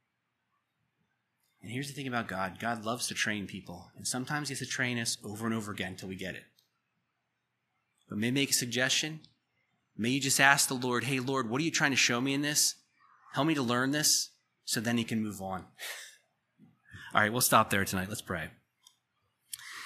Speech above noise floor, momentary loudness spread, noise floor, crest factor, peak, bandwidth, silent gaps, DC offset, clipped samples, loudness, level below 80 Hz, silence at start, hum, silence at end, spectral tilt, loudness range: 51 dB; 16 LU; -82 dBFS; 28 dB; -6 dBFS; 15 kHz; none; under 0.1%; under 0.1%; -30 LUFS; -72 dBFS; 1.65 s; none; 0 s; -2.5 dB/octave; 8 LU